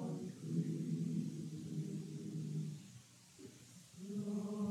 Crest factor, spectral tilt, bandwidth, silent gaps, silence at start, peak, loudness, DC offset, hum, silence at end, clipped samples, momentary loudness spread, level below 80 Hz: 16 dB; -7.5 dB/octave; 13.5 kHz; none; 0 s; -28 dBFS; -44 LUFS; under 0.1%; none; 0 s; under 0.1%; 17 LU; -84 dBFS